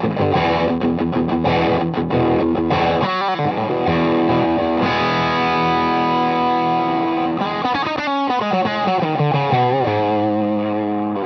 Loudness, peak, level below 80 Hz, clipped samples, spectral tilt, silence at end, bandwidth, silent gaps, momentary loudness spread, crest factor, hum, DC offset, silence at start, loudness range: -18 LUFS; -4 dBFS; -48 dBFS; under 0.1%; -7.5 dB/octave; 0 s; 6.4 kHz; none; 3 LU; 14 dB; none; under 0.1%; 0 s; 1 LU